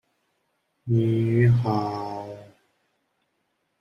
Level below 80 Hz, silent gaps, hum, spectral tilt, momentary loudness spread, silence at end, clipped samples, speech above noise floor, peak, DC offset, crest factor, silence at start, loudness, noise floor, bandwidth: -58 dBFS; none; none; -9.5 dB/octave; 21 LU; 1.35 s; under 0.1%; 53 dB; -8 dBFS; under 0.1%; 16 dB; 0.85 s; -23 LUFS; -74 dBFS; 5.8 kHz